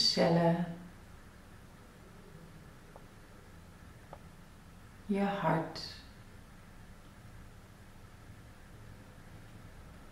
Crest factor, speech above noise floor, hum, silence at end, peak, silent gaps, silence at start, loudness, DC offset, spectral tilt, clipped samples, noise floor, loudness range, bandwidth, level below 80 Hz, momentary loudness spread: 22 dB; 23 dB; none; 0 s; -16 dBFS; none; 0 s; -32 LUFS; under 0.1%; -5.5 dB/octave; under 0.1%; -54 dBFS; 16 LU; 15 kHz; -58 dBFS; 24 LU